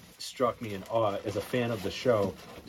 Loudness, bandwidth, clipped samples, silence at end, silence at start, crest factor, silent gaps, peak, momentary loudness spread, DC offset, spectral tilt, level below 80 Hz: -31 LUFS; 17 kHz; under 0.1%; 0 s; 0 s; 18 dB; none; -12 dBFS; 7 LU; under 0.1%; -5.5 dB/octave; -60 dBFS